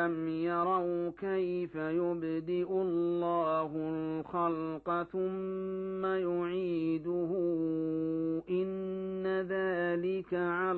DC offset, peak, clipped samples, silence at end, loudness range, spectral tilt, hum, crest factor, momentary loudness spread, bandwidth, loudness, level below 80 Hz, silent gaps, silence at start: under 0.1%; -18 dBFS; under 0.1%; 0 s; 1 LU; -6.5 dB/octave; none; 14 dB; 5 LU; 4.5 kHz; -33 LUFS; -68 dBFS; none; 0 s